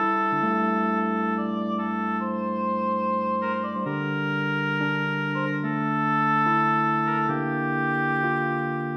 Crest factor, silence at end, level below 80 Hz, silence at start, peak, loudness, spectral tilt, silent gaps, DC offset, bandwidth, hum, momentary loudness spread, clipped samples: 12 dB; 0 s; -80 dBFS; 0 s; -12 dBFS; -25 LUFS; -8 dB/octave; none; under 0.1%; 6.4 kHz; none; 6 LU; under 0.1%